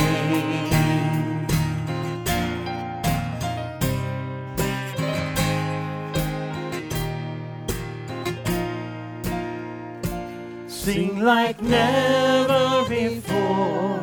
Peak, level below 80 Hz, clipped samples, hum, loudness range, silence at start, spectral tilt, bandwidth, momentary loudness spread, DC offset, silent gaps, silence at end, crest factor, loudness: -6 dBFS; -42 dBFS; under 0.1%; none; 8 LU; 0 s; -5.5 dB/octave; over 20 kHz; 12 LU; under 0.1%; none; 0 s; 18 dB; -24 LUFS